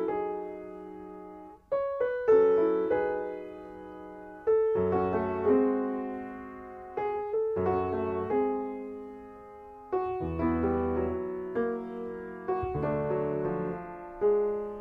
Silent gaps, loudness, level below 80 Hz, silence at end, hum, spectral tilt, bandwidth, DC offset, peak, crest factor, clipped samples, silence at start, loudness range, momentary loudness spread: none; -30 LUFS; -54 dBFS; 0 s; none; -10 dB/octave; 4.3 kHz; under 0.1%; -12 dBFS; 18 dB; under 0.1%; 0 s; 4 LU; 18 LU